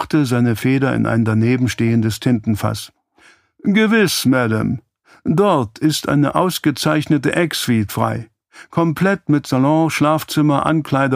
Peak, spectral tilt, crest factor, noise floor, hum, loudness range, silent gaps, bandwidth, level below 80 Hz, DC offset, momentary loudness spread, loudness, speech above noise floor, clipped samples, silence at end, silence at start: 0 dBFS; -6 dB/octave; 16 dB; -52 dBFS; none; 2 LU; none; 15.5 kHz; -50 dBFS; under 0.1%; 6 LU; -17 LUFS; 36 dB; under 0.1%; 0 s; 0 s